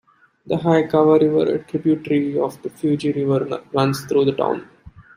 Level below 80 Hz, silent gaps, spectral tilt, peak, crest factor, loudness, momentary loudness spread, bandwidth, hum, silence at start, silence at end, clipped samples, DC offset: -58 dBFS; none; -7.5 dB/octave; -2 dBFS; 18 dB; -19 LUFS; 9 LU; 15.5 kHz; none; 0.45 s; 0.15 s; under 0.1%; under 0.1%